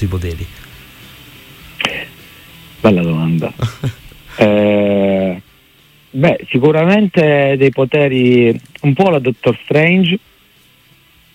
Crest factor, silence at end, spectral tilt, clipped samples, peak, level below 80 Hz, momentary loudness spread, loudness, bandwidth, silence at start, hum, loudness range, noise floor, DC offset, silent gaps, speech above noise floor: 14 dB; 1.15 s; -7.5 dB/octave; under 0.1%; 0 dBFS; -44 dBFS; 14 LU; -13 LUFS; 16.5 kHz; 0 s; none; 7 LU; -49 dBFS; under 0.1%; none; 37 dB